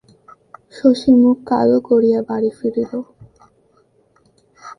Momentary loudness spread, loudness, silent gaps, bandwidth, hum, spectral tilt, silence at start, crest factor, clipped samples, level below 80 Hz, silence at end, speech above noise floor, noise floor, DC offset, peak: 12 LU; -16 LUFS; none; 10 kHz; none; -7.5 dB/octave; 0.75 s; 18 dB; under 0.1%; -56 dBFS; 0.05 s; 42 dB; -57 dBFS; under 0.1%; 0 dBFS